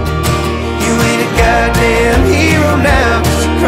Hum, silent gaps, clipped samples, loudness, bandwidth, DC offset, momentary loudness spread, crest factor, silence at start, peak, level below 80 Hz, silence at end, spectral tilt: none; none; under 0.1%; -11 LUFS; 16.5 kHz; under 0.1%; 4 LU; 10 dB; 0 s; 0 dBFS; -18 dBFS; 0 s; -5 dB/octave